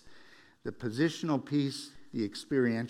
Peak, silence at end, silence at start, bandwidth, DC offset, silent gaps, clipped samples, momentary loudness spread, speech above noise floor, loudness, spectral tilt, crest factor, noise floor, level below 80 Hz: -16 dBFS; 0 s; 0.05 s; 14 kHz; under 0.1%; none; under 0.1%; 12 LU; 26 dB; -33 LUFS; -6 dB/octave; 16 dB; -58 dBFS; -68 dBFS